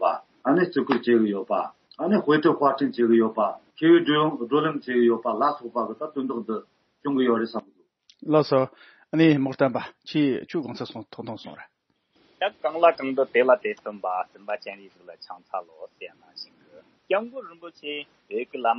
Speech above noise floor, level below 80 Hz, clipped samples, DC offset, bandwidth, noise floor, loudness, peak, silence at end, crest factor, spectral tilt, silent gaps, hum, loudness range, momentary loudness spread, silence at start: 43 dB; -76 dBFS; under 0.1%; under 0.1%; 6.2 kHz; -67 dBFS; -24 LUFS; -4 dBFS; 0 s; 20 dB; -8 dB/octave; none; none; 12 LU; 19 LU; 0 s